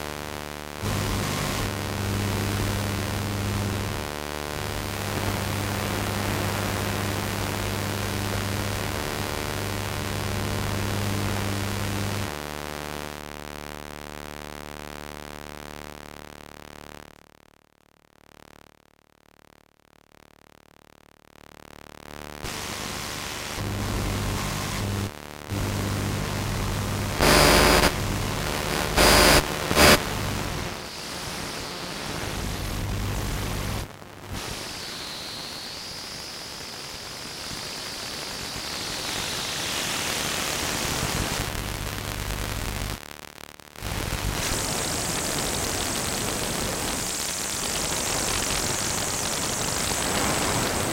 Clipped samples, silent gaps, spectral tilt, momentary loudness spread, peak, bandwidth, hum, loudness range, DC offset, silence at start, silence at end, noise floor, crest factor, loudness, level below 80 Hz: under 0.1%; none; -3 dB/octave; 14 LU; -2 dBFS; 17 kHz; none; 16 LU; under 0.1%; 0 s; 0 s; -60 dBFS; 24 dB; -26 LUFS; -38 dBFS